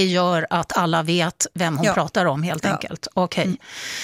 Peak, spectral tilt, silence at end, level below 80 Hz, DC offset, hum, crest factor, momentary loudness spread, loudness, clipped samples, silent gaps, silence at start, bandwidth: -4 dBFS; -4.5 dB/octave; 0 s; -56 dBFS; under 0.1%; none; 18 dB; 6 LU; -21 LUFS; under 0.1%; none; 0 s; 16 kHz